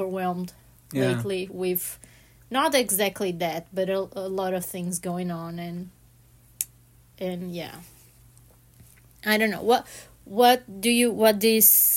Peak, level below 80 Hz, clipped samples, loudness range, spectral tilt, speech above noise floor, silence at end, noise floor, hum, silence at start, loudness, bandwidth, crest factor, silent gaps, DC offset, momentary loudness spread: -2 dBFS; -60 dBFS; under 0.1%; 13 LU; -3.5 dB/octave; 31 dB; 0 s; -55 dBFS; none; 0 s; -24 LUFS; 16.5 kHz; 24 dB; none; under 0.1%; 16 LU